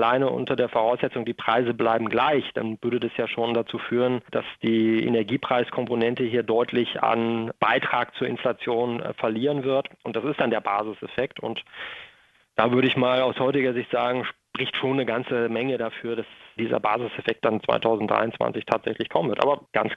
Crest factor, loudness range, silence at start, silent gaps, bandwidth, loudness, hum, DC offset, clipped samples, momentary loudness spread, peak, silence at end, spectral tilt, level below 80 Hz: 22 dB; 3 LU; 0 s; none; 7.2 kHz; -25 LUFS; none; under 0.1%; under 0.1%; 8 LU; -2 dBFS; 0 s; -7.5 dB/octave; -64 dBFS